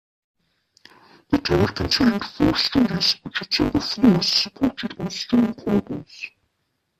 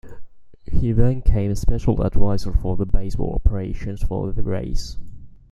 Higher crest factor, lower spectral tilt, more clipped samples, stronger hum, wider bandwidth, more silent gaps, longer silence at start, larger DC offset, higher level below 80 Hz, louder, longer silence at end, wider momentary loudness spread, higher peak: about the same, 20 dB vs 16 dB; second, -5 dB/octave vs -8 dB/octave; neither; neither; first, 14 kHz vs 7.6 kHz; neither; first, 1.3 s vs 0.05 s; neither; second, -44 dBFS vs -24 dBFS; first, -21 LUFS vs -24 LUFS; first, 0.7 s vs 0.25 s; about the same, 11 LU vs 9 LU; about the same, -4 dBFS vs -2 dBFS